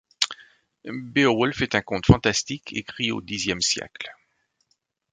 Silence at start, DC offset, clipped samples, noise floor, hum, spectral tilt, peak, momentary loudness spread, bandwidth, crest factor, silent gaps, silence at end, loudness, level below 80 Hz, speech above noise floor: 0.2 s; under 0.1%; under 0.1%; -72 dBFS; none; -4 dB/octave; 0 dBFS; 17 LU; 9.6 kHz; 26 dB; none; 1 s; -23 LUFS; -42 dBFS; 49 dB